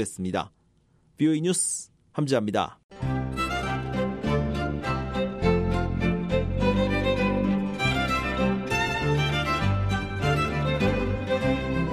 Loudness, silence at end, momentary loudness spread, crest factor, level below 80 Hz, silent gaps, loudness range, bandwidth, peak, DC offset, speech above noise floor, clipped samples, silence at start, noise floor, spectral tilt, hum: -26 LUFS; 0 s; 5 LU; 18 dB; -38 dBFS; 2.84-2.89 s; 3 LU; 13.5 kHz; -8 dBFS; under 0.1%; 37 dB; under 0.1%; 0 s; -63 dBFS; -5.5 dB/octave; none